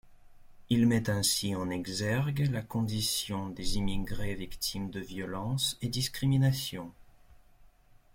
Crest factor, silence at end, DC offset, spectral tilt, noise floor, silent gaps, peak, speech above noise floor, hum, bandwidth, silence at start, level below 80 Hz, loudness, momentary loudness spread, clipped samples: 16 dB; 0.5 s; under 0.1%; -4.5 dB/octave; -59 dBFS; none; -16 dBFS; 28 dB; none; 16.5 kHz; 0.05 s; -46 dBFS; -31 LUFS; 11 LU; under 0.1%